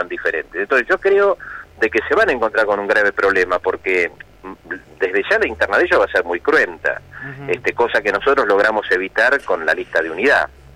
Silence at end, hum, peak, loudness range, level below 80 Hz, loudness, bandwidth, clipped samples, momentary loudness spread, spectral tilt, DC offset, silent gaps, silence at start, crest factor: 0.3 s; none; -6 dBFS; 2 LU; -48 dBFS; -17 LUFS; 12.5 kHz; under 0.1%; 10 LU; -4.5 dB/octave; under 0.1%; none; 0 s; 12 dB